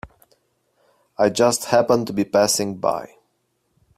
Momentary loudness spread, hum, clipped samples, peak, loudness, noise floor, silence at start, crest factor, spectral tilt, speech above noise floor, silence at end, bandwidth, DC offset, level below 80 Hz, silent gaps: 7 LU; none; under 0.1%; -2 dBFS; -19 LUFS; -70 dBFS; 0.05 s; 20 dB; -3.5 dB/octave; 51 dB; 0.9 s; 16 kHz; under 0.1%; -58 dBFS; none